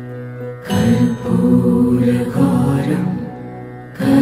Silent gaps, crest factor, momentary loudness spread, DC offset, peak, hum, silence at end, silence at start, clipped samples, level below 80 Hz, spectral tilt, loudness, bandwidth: none; 14 dB; 16 LU; under 0.1%; -2 dBFS; none; 0 s; 0 s; under 0.1%; -44 dBFS; -8 dB/octave; -16 LUFS; 15 kHz